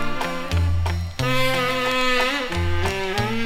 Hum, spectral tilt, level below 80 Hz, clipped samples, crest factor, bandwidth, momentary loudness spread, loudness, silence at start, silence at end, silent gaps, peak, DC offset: none; -5 dB/octave; -32 dBFS; under 0.1%; 18 dB; 16 kHz; 5 LU; -22 LUFS; 0 s; 0 s; none; -4 dBFS; under 0.1%